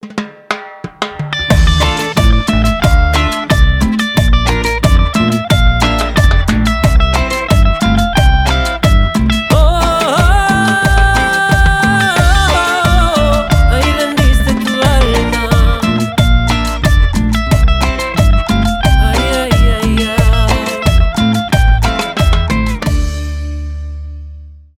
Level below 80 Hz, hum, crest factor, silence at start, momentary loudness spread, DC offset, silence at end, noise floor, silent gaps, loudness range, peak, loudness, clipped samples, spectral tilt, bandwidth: -14 dBFS; none; 10 dB; 0.05 s; 7 LU; under 0.1%; 0.25 s; -31 dBFS; none; 2 LU; 0 dBFS; -12 LUFS; under 0.1%; -5 dB/octave; 16 kHz